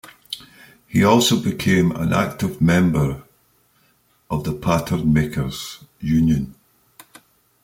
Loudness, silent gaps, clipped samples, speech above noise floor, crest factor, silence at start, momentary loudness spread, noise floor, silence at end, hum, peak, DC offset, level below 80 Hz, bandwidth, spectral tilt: -19 LUFS; none; under 0.1%; 42 dB; 18 dB; 0.05 s; 17 LU; -60 dBFS; 1.1 s; none; -2 dBFS; under 0.1%; -42 dBFS; 16.5 kHz; -5.5 dB/octave